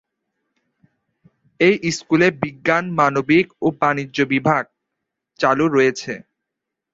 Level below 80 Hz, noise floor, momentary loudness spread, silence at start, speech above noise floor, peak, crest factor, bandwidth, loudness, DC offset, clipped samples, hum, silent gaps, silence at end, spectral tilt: -58 dBFS; -82 dBFS; 6 LU; 1.6 s; 64 dB; -2 dBFS; 18 dB; 8 kHz; -18 LUFS; under 0.1%; under 0.1%; none; none; 0.7 s; -5.5 dB/octave